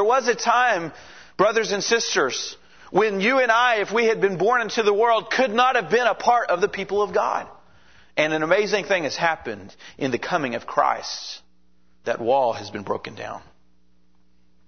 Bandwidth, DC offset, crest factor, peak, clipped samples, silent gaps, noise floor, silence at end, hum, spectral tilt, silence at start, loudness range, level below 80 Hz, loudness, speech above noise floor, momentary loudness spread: 6.6 kHz; 0.3%; 20 dB; -2 dBFS; under 0.1%; none; -64 dBFS; 1.3 s; none; -3 dB/octave; 0 s; 7 LU; -62 dBFS; -21 LUFS; 42 dB; 14 LU